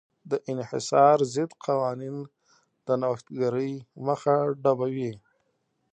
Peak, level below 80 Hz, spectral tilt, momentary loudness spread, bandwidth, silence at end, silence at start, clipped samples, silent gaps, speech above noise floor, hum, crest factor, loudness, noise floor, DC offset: -6 dBFS; -74 dBFS; -6.5 dB/octave; 15 LU; 9.4 kHz; 0.75 s; 0.25 s; under 0.1%; none; 48 dB; none; 20 dB; -26 LUFS; -74 dBFS; under 0.1%